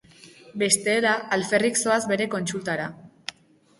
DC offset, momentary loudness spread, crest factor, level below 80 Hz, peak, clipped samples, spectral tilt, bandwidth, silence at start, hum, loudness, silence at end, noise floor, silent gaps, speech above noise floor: under 0.1%; 17 LU; 22 dB; -66 dBFS; -4 dBFS; under 0.1%; -3 dB/octave; 12 kHz; 0.25 s; none; -23 LUFS; 0.5 s; -54 dBFS; none; 31 dB